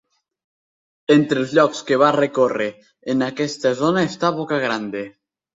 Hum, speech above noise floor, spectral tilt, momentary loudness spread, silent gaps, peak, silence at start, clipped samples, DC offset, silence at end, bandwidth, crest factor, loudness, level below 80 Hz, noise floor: none; over 72 dB; -5.5 dB/octave; 12 LU; none; -2 dBFS; 1.1 s; under 0.1%; under 0.1%; 0.45 s; 7.8 kHz; 18 dB; -19 LUFS; -64 dBFS; under -90 dBFS